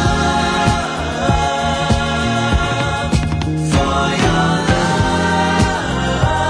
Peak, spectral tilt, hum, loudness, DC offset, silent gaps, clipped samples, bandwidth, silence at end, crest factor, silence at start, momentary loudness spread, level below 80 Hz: -2 dBFS; -5 dB/octave; none; -16 LUFS; under 0.1%; none; under 0.1%; 10.5 kHz; 0 s; 14 dB; 0 s; 3 LU; -26 dBFS